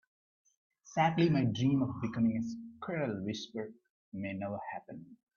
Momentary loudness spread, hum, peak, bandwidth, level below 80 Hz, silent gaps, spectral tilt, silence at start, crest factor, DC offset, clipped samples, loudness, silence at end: 16 LU; none; -16 dBFS; 7.2 kHz; -70 dBFS; 3.90-4.12 s; -7 dB/octave; 0.85 s; 18 dB; under 0.1%; under 0.1%; -34 LUFS; 0.2 s